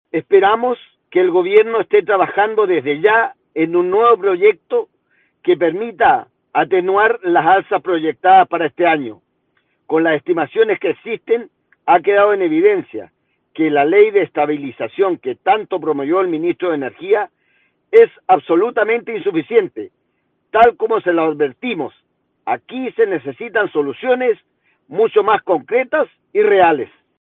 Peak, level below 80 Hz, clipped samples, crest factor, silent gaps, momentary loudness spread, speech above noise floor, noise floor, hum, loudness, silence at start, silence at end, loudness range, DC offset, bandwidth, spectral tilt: 0 dBFS; -60 dBFS; under 0.1%; 16 dB; none; 11 LU; 52 dB; -67 dBFS; none; -15 LUFS; 0.15 s; 0.35 s; 4 LU; under 0.1%; 4.1 kHz; -8 dB/octave